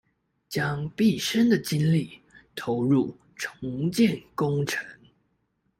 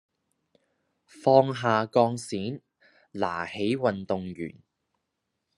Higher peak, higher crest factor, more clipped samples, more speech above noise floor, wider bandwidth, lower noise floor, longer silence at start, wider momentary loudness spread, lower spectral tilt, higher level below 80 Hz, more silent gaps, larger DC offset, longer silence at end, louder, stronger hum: second, -10 dBFS vs -6 dBFS; second, 16 dB vs 24 dB; neither; second, 48 dB vs 55 dB; first, 16 kHz vs 12 kHz; second, -73 dBFS vs -81 dBFS; second, 0.5 s vs 1.15 s; second, 13 LU vs 17 LU; about the same, -6 dB/octave vs -6 dB/octave; first, -60 dBFS vs -72 dBFS; neither; neither; second, 0.85 s vs 1.05 s; about the same, -26 LUFS vs -26 LUFS; neither